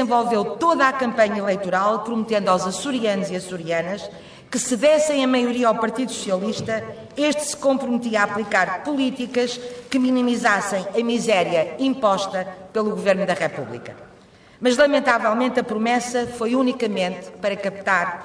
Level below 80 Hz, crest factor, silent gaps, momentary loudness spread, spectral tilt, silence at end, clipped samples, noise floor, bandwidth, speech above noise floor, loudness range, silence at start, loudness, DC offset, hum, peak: -60 dBFS; 16 dB; none; 9 LU; -4 dB/octave; 0 s; under 0.1%; -49 dBFS; 11 kHz; 28 dB; 2 LU; 0 s; -21 LUFS; under 0.1%; none; -4 dBFS